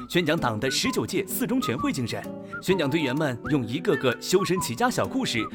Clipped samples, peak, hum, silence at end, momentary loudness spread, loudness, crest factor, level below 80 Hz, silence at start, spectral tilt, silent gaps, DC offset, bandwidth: under 0.1%; -8 dBFS; none; 0 s; 4 LU; -25 LUFS; 18 dB; -54 dBFS; 0 s; -4.5 dB/octave; none; under 0.1%; 19.5 kHz